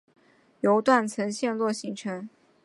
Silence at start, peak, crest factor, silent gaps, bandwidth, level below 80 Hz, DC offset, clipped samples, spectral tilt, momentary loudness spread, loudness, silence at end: 0.65 s; -6 dBFS; 20 dB; none; 11.5 kHz; -76 dBFS; under 0.1%; under 0.1%; -5 dB/octave; 14 LU; -26 LUFS; 0.35 s